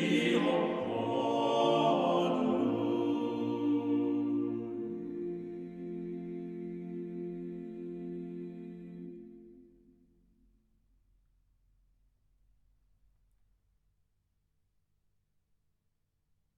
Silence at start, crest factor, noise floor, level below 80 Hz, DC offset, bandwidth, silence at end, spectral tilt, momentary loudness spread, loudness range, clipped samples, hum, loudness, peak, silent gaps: 0 s; 20 dB; -78 dBFS; -72 dBFS; under 0.1%; 9.8 kHz; 6.95 s; -6.5 dB/octave; 15 LU; 17 LU; under 0.1%; none; -33 LUFS; -16 dBFS; none